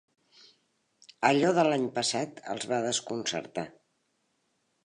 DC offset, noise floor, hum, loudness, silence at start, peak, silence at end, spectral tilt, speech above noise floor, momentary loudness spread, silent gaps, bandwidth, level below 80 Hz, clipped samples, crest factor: under 0.1%; -75 dBFS; none; -29 LUFS; 1.2 s; -8 dBFS; 1.15 s; -3.5 dB/octave; 47 dB; 13 LU; none; 11 kHz; -76 dBFS; under 0.1%; 24 dB